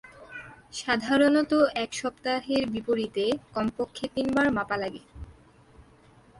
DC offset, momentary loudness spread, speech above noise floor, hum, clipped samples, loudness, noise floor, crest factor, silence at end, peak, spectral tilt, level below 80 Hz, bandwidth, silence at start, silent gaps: under 0.1%; 21 LU; 30 dB; none; under 0.1%; -27 LUFS; -56 dBFS; 18 dB; 0.6 s; -10 dBFS; -4.5 dB/octave; -56 dBFS; 11.5 kHz; 0.05 s; none